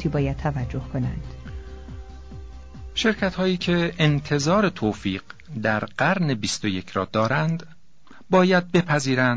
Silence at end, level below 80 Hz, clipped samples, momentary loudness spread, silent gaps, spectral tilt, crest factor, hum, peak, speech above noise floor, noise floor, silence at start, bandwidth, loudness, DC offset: 0 s; -42 dBFS; under 0.1%; 20 LU; none; -5.5 dB/octave; 18 dB; none; -4 dBFS; 30 dB; -52 dBFS; 0 s; 8 kHz; -23 LUFS; 0.5%